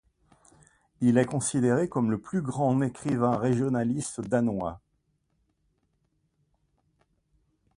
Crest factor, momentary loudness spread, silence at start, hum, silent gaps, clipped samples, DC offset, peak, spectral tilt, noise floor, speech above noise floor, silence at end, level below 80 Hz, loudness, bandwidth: 20 dB; 6 LU; 1 s; none; none; under 0.1%; under 0.1%; -10 dBFS; -6.5 dB/octave; -74 dBFS; 48 dB; 3 s; -60 dBFS; -27 LUFS; 11.5 kHz